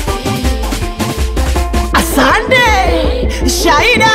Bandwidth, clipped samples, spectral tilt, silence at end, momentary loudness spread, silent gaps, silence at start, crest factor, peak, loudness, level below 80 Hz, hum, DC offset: 16.5 kHz; under 0.1%; -4 dB/octave; 0 s; 9 LU; none; 0 s; 10 dB; 0 dBFS; -12 LUFS; -16 dBFS; none; under 0.1%